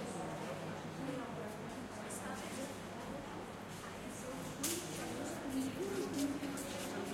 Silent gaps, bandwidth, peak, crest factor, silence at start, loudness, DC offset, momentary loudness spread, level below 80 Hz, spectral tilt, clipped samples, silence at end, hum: none; 16.5 kHz; -22 dBFS; 20 dB; 0 s; -43 LUFS; under 0.1%; 7 LU; -66 dBFS; -4 dB/octave; under 0.1%; 0 s; none